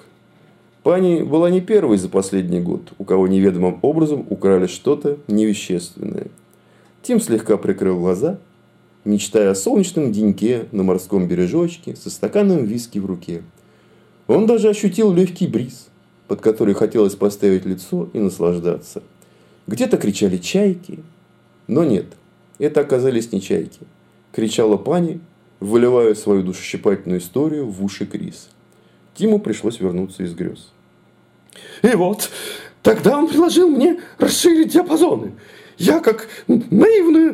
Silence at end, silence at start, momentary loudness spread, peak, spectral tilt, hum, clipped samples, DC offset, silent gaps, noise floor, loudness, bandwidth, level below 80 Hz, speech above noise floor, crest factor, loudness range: 0 s; 0.85 s; 14 LU; -2 dBFS; -6 dB/octave; none; under 0.1%; under 0.1%; none; -53 dBFS; -17 LUFS; 16 kHz; -58 dBFS; 36 dB; 16 dB; 6 LU